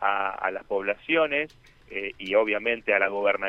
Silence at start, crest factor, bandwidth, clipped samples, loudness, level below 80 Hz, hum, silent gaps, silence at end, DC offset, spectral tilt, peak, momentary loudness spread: 0 s; 18 dB; 6.6 kHz; under 0.1%; -26 LUFS; -60 dBFS; none; none; 0 s; under 0.1%; -5.5 dB/octave; -8 dBFS; 10 LU